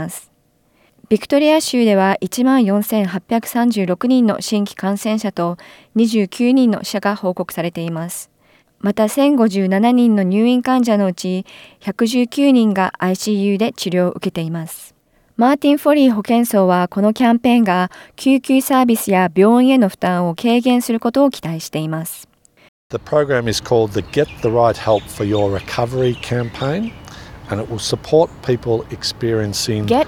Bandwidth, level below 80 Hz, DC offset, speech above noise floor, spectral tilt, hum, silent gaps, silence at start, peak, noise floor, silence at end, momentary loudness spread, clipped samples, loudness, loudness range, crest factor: 17.5 kHz; -50 dBFS; under 0.1%; 43 dB; -5.5 dB/octave; none; 22.68-22.90 s; 0 s; -2 dBFS; -58 dBFS; 0 s; 11 LU; under 0.1%; -16 LUFS; 5 LU; 14 dB